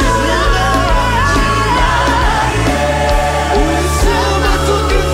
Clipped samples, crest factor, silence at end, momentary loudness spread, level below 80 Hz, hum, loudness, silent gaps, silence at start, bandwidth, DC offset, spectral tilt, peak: under 0.1%; 12 dB; 0 s; 1 LU; -18 dBFS; none; -13 LUFS; none; 0 s; 16 kHz; under 0.1%; -4.5 dB/octave; 0 dBFS